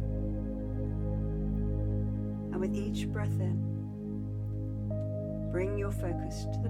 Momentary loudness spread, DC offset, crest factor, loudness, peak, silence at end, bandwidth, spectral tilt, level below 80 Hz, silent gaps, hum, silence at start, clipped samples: 4 LU; under 0.1%; 12 dB; -35 LUFS; -20 dBFS; 0 s; 12.5 kHz; -8.5 dB/octave; -40 dBFS; none; 50 Hz at -65 dBFS; 0 s; under 0.1%